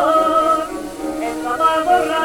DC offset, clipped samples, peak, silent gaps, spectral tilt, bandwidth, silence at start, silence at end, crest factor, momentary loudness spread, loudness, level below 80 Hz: under 0.1%; under 0.1%; -2 dBFS; none; -3.5 dB/octave; 17.5 kHz; 0 s; 0 s; 14 dB; 12 LU; -17 LUFS; -46 dBFS